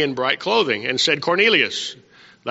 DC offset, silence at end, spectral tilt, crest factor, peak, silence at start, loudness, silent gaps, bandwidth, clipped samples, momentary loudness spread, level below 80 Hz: under 0.1%; 0 s; -0.5 dB/octave; 18 dB; -2 dBFS; 0 s; -18 LUFS; none; 8 kHz; under 0.1%; 12 LU; -66 dBFS